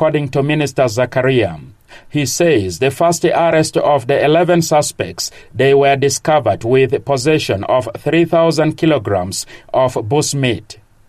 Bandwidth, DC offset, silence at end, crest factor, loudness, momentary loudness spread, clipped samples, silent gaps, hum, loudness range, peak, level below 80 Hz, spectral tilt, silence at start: 15 kHz; under 0.1%; 0.35 s; 12 dB; -14 LUFS; 8 LU; under 0.1%; none; none; 2 LU; -2 dBFS; -48 dBFS; -5 dB/octave; 0 s